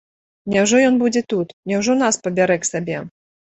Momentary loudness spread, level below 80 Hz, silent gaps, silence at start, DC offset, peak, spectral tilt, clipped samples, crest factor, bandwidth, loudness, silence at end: 13 LU; -58 dBFS; 1.53-1.63 s; 0.45 s; under 0.1%; -2 dBFS; -4 dB/octave; under 0.1%; 16 dB; 8.4 kHz; -18 LUFS; 0.45 s